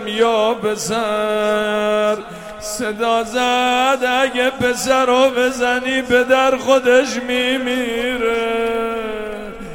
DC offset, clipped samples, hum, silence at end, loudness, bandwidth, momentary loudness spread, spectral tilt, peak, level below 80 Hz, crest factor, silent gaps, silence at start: under 0.1%; under 0.1%; none; 0 s; -17 LUFS; 16.5 kHz; 9 LU; -3 dB/octave; 0 dBFS; -46 dBFS; 16 dB; none; 0 s